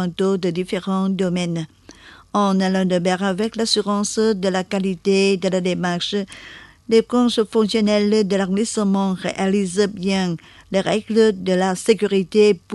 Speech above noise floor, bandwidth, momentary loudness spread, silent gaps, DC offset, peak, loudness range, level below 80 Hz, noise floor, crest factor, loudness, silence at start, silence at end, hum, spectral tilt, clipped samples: 26 dB; 12 kHz; 7 LU; none; under 0.1%; -2 dBFS; 2 LU; -54 dBFS; -45 dBFS; 16 dB; -19 LUFS; 0 s; 0 s; none; -5.5 dB/octave; under 0.1%